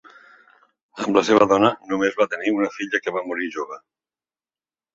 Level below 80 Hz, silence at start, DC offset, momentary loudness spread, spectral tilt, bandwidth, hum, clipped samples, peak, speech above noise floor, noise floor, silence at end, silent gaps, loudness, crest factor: -62 dBFS; 0.95 s; under 0.1%; 13 LU; -4.5 dB/octave; 8 kHz; none; under 0.1%; -2 dBFS; over 70 dB; under -90 dBFS; 1.15 s; none; -21 LUFS; 20 dB